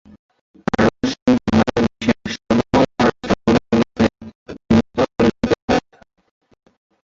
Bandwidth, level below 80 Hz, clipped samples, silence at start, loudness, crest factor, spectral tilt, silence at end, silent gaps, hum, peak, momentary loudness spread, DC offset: 7.6 kHz; -40 dBFS; under 0.1%; 0.8 s; -18 LUFS; 16 dB; -6.5 dB/octave; 1.3 s; 1.22-1.26 s, 4.35-4.46 s, 5.62-5.68 s; none; -2 dBFS; 5 LU; under 0.1%